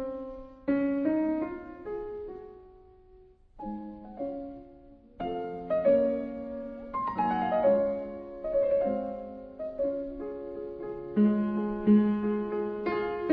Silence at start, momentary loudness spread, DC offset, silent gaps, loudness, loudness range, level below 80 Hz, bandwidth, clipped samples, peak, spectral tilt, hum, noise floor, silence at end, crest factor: 0 s; 16 LU; under 0.1%; none; -30 LUFS; 12 LU; -56 dBFS; 5 kHz; under 0.1%; -12 dBFS; -10.5 dB/octave; none; -56 dBFS; 0 s; 18 dB